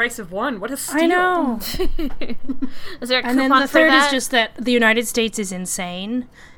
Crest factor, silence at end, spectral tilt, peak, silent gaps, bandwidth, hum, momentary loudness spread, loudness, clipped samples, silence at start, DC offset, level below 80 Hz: 18 dB; 0.05 s; -3 dB/octave; 0 dBFS; none; 19 kHz; none; 15 LU; -18 LUFS; under 0.1%; 0 s; under 0.1%; -34 dBFS